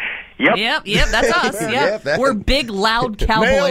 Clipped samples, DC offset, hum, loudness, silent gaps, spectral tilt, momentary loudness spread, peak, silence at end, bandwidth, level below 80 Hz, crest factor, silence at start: under 0.1%; under 0.1%; none; -16 LUFS; none; -4 dB/octave; 4 LU; -2 dBFS; 0 s; 16 kHz; -28 dBFS; 14 dB; 0 s